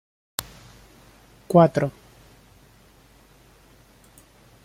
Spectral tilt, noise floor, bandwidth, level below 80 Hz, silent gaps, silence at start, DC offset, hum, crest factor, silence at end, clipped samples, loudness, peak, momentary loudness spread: -6.5 dB/octave; -54 dBFS; 16 kHz; -58 dBFS; none; 0.4 s; under 0.1%; none; 26 dB; 2.75 s; under 0.1%; -22 LUFS; -2 dBFS; 17 LU